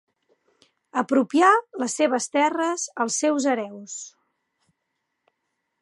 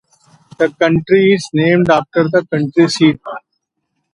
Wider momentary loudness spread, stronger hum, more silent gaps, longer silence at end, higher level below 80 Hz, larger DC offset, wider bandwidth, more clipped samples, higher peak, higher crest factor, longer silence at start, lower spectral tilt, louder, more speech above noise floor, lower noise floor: first, 17 LU vs 7 LU; neither; neither; first, 1.75 s vs 0.75 s; second, -82 dBFS vs -50 dBFS; neither; about the same, 11.5 kHz vs 11 kHz; neither; second, -4 dBFS vs 0 dBFS; first, 20 dB vs 14 dB; first, 0.95 s vs 0.6 s; second, -2.5 dB/octave vs -6 dB/octave; second, -22 LUFS vs -13 LUFS; about the same, 56 dB vs 59 dB; first, -78 dBFS vs -71 dBFS